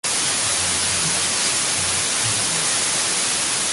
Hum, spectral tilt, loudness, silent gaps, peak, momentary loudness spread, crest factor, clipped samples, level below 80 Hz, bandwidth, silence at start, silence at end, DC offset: none; 0 dB/octave; -18 LUFS; none; -6 dBFS; 1 LU; 14 dB; under 0.1%; -50 dBFS; 12 kHz; 0.05 s; 0 s; under 0.1%